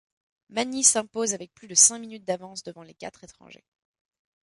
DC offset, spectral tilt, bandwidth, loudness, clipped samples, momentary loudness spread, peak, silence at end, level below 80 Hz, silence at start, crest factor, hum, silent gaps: under 0.1%; -1 dB/octave; 11.5 kHz; -22 LUFS; under 0.1%; 24 LU; -4 dBFS; 1 s; -72 dBFS; 0.55 s; 24 dB; none; none